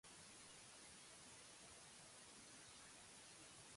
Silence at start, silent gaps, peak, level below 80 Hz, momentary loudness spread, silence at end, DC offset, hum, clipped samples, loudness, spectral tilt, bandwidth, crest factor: 0.05 s; none; -50 dBFS; -84 dBFS; 0 LU; 0 s; under 0.1%; none; under 0.1%; -60 LUFS; -1.5 dB/octave; 11.5 kHz; 12 dB